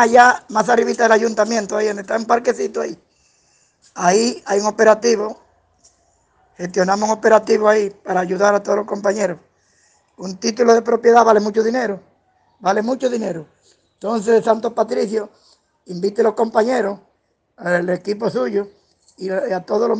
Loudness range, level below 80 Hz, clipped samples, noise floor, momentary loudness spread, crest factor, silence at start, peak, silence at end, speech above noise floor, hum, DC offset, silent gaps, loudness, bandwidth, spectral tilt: 4 LU; -64 dBFS; under 0.1%; -65 dBFS; 14 LU; 18 dB; 0 s; 0 dBFS; 0 s; 49 dB; none; under 0.1%; none; -17 LUFS; 9.8 kHz; -4.5 dB/octave